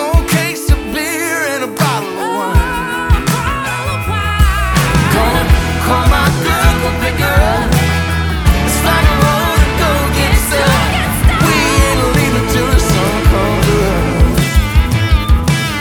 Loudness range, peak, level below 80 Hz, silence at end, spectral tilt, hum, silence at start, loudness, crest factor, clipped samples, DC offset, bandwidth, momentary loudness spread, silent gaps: 3 LU; 0 dBFS; -16 dBFS; 0 s; -5 dB/octave; none; 0 s; -13 LUFS; 12 dB; under 0.1%; under 0.1%; 19.5 kHz; 5 LU; none